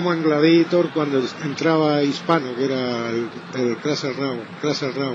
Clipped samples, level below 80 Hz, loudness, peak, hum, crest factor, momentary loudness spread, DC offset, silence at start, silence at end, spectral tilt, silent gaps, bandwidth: under 0.1%; -74 dBFS; -21 LUFS; -2 dBFS; none; 18 dB; 10 LU; under 0.1%; 0 s; 0 s; -6 dB/octave; none; 7.6 kHz